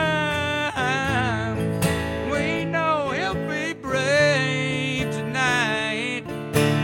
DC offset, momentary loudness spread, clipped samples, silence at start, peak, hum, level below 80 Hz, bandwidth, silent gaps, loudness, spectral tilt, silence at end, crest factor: under 0.1%; 6 LU; under 0.1%; 0 s; -6 dBFS; none; -46 dBFS; 17 kHz; none; -23 LUFS; -5 dB/octave; 0 s; 18 dB